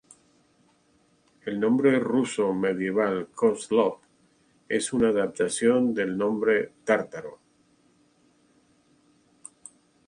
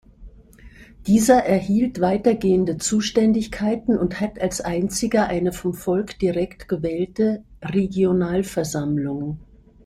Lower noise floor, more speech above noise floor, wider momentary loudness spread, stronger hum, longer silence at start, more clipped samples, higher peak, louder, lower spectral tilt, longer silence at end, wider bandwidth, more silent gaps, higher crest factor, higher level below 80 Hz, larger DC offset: first, -65 dBFS vs -46 dBFS; first, 40 dB vs 25 dB; first, 15 LU vs 8 LU; neither; first, 1.45 s vs 0.2 s; neither; second, -8 dBFS vs -2 dBFS; second, -25 LUFS vs -21 LUFS; about the same, -5 dB/octave vs -5.5 dB/octave; first, 2.7 s vs 0.4 s; second, 11 kHz vs 15 kHz; neither; about the same, 18 dB vs 18 dB; second, -66 dBFS vs -46 dBFS; neither